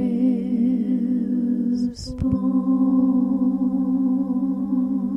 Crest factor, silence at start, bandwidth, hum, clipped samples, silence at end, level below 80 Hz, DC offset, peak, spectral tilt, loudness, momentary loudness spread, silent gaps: 12 dB; 0 s; 7.8 kHz; none; under 0.1%; 0 s; -44 dBFS; under 0.1%; -8 dBFS; -9 dB/octave; -21 LUFS; 4 LU; none